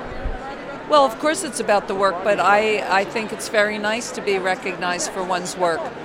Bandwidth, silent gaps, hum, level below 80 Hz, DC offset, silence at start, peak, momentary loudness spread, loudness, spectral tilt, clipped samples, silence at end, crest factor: 16.5 kHz; none; none; -42 dBFS; under 0.1%; 0 s; -2 dBFS; 11 LU; -20 LUFS; -3 dB/octave; under 0.1%; 0 s; 20 dB